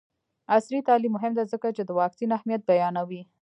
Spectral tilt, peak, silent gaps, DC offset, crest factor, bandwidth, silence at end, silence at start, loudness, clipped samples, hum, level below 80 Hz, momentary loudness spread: -7 dB/octave; -8 dBFS; none; under 0.1%; 18 dB; 9.8 kHz; 0.2 s; 0.5 s; -25 LUFS; under 0.1%; none; -80 dBFS; 6 LU